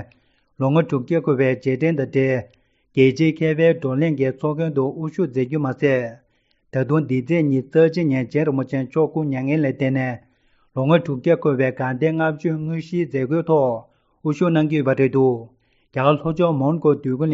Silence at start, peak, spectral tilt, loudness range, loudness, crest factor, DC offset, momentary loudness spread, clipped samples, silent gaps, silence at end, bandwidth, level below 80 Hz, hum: 0 s; -2 dBFS; -7.5 dB/octave; 2 LU; -20 LUFS; 18 dB; under 0.1%; 7 LU; under 0.1%; none; 0 s; 7.4 kHz; -60 dBFS; none